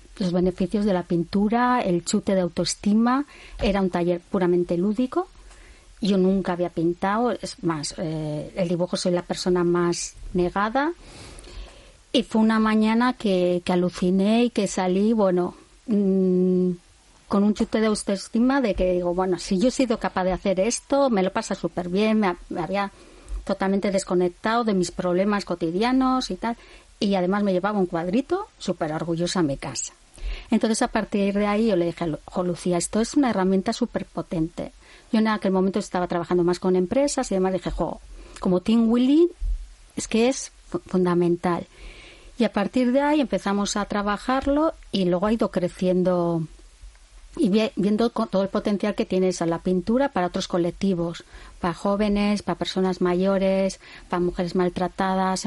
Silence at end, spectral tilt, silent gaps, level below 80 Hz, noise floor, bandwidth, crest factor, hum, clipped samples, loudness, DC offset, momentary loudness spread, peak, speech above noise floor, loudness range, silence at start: 0 s; -5.5 dB/octave; none; -44 dBFS; -48 dBFS; 11.5 kHz; 16 dB; none; under 0.1%; -23 LUFS; under 0.1%; 9 LU; -8 dBFS; 25 dB; 3 LU; 0.1 s